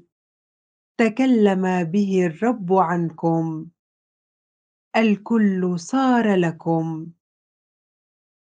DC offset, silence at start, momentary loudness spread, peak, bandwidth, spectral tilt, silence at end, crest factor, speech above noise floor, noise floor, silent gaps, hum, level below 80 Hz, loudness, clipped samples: under 0.1%; 1 s; 9 LU; -4 dBFS; 9.2 kHz; -7 dB/octave; 1.3 s; 18 dB; over 71 dB; under -90 dBFS; 3.79-4.91 s; none; -72 dBFS; -20 LUFS; under 0.1%